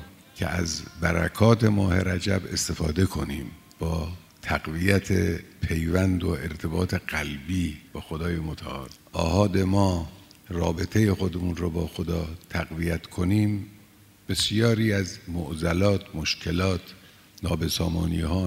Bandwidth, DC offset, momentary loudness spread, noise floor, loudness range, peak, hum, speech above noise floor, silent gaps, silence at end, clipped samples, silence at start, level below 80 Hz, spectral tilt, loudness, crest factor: 16 kHz; under 0.1%; 11 LU; -54 dBFS; 3 LU; -4 dBFS; none; 28 dB; none; 0 s; under 0.1%; 0 s; -40 dBFS; -5.5 dB/octave; -26 LUFS; 22 dB